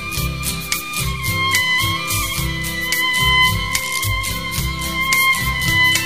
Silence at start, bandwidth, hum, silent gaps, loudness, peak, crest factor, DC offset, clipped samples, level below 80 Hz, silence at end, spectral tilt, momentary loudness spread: 0 s; 16 kHz; none; none; -17 LUFS; 0 dBFS; 18 dB; 0.9%; under 0.1%; -30 dBFS; 0 s; -2 dB/octave; 8 LU